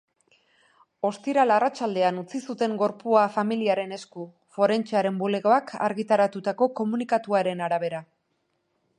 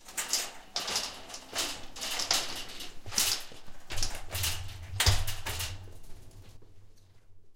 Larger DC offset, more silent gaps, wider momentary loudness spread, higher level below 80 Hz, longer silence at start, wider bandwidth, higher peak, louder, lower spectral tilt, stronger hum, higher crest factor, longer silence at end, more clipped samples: neither; neither; second, 11 LU vs 15 LU; second, -78 dBFS vs -42 dBFS; first, 1.05 s vs 0 s; second, 10.5 kHz vs 17 kHz; about the same, -6 dBFS vs -8 dBFS; first, -25 LUFS vs -32 LUFS; first, -6 dB/octave vs -1.5 dB/octave; neither; about the same, 20 dB vs 24 dB; first, 0.95 s vs 0 s; neither